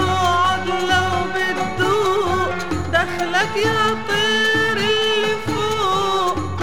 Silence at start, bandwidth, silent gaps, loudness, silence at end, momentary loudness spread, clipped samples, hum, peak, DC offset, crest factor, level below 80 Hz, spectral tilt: 0 s; 16.5 kHz; none; -18 LUFS; 0 s; 4 LU; under 0.1%; none; -4 dBFS; 2%; 16 dB; -42 dBFS; -4 dB/octave